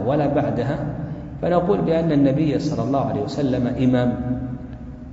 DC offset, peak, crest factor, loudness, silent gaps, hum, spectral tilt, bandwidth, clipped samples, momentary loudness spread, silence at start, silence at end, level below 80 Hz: under 0.1%; -4 dBFS; 16 dB; -21 LUFS; none; none; -8.5 dB/octave; 7.8 kHz; under 0.1%; 12 LU; 0 s; 0 s; -40 dBFS